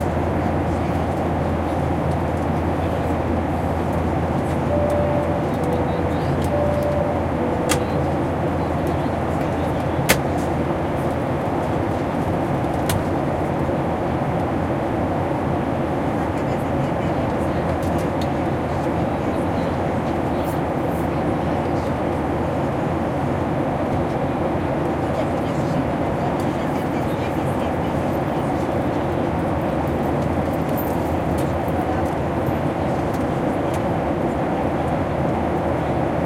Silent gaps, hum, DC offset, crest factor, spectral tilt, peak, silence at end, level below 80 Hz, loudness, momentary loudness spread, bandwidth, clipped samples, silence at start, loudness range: none; none; under 0.1%; 20 dB; -7 dB/octave; 0 dBFS; 0 s; -38 dBFS; -22 LUFS; 2 LU; 16.5 kHz; under 0.1%; 0 s; 1 LU